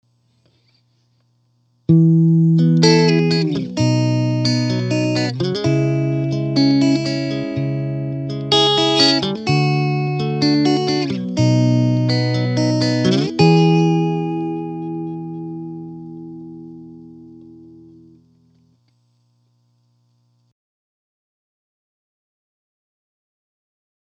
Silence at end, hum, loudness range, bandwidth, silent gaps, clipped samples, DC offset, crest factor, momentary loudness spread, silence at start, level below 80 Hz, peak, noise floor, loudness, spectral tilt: 6.45 s; 60 Hz at -50 dBFS; 13 LU; 8.8 kHz; none; under 0.1%; under 0.1%; 18 dB; 16 LU; 1.9 s; -56 dBFS; 0 dBFS; -61 dBFS; -17 LUFS; -6 dB/octave